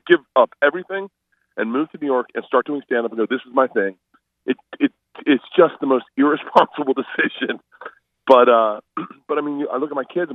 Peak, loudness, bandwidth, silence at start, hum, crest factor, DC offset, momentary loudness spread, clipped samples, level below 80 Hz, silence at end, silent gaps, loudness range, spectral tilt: 0 dBFS; -19 LUFS; 6.2 kHz; 0.05 s; none; 20 dB; under 0.1%; 15 LU; under 0.1%; -70 dBFS; 0 s; none; 4 LU; -7 dB/octave